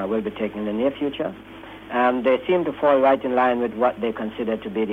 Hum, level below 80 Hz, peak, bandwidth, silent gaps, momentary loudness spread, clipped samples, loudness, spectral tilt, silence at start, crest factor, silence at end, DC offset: none; -56 dBFS; -6 dBFS; 4.8 kHz; none; 11 LU; under 0.1%; -22 LUFS; -7.5 dB/octave; 0 s; 16 dB; 0 s; under 0.1%